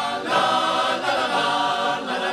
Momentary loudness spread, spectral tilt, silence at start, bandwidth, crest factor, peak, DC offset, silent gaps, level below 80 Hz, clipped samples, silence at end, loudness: 4 LU; -2.5 dB/octave; 0 s; 14.5 kHz; 16 dB; -6 dBFS; under 0.1%; none; -62 dBFS; under 0.1%; 0 s; -21 LUFS